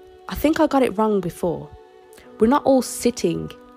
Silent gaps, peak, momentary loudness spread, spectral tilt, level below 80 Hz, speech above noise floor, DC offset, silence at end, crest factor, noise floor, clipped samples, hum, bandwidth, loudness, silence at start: none; -4 dBFS; 9 LU; -5.5 dB/octave; -44 dBFS; 27 dB; under 0.1%; 0.2 s; 16 dB; -46 dBFS; under 0.1%; none; 16 kHz; -20 LUFS; 0.3 s